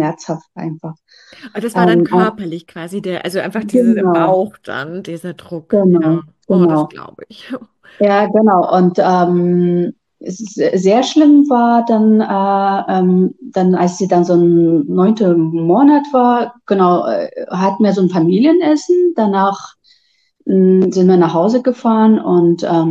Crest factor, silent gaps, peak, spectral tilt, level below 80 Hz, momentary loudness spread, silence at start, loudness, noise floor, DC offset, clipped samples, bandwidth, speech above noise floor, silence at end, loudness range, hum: 12 dB; none; 0 dBFS; -7.5 dB/octave; -62 dBFS; 15 LU; 0 s; -13 LUFS; -58 dBFS; under 0.1%; under 0.1%; 12 kHz; 45 dB; 0 s; 5 LU; none